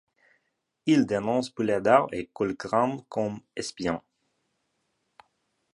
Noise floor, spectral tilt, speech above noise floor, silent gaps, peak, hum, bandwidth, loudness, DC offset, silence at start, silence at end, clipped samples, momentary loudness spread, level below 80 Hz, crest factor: -77 dBFS; -5.5 dB/octave; 51 dB; none; -4 dBFS; none; 11.5 kHz; -27 LUFS; under 0.1%; 0.85 s; 1.75 s; under 0.1%; 11 LU; -62 dBFS; 24 dB